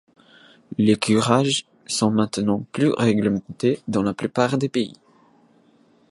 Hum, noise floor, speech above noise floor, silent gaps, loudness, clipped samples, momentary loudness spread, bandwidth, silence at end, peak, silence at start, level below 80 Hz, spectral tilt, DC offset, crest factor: none; -57 dBFS; 37 dB; none; -21 LUFS; under 0.1%; 7 LU; 11.5 kHz; 1.2 s; -2 dBFS; 0.7 s; -58 dBFS; -5.5 dB/octave; under 0.1%; 20 dB